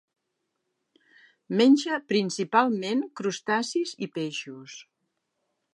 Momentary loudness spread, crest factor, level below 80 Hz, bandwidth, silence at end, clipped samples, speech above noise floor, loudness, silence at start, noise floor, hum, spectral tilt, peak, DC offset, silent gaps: 18 LU; 20 dB; -84 dBFS; 11 kHz; 0.95 s; under 0.1%; 55 dB; -26 LUFS; 1.5 s; -80 dBFS; none; -4.5 dB/octave; -8 dBFS; under 0.1%; none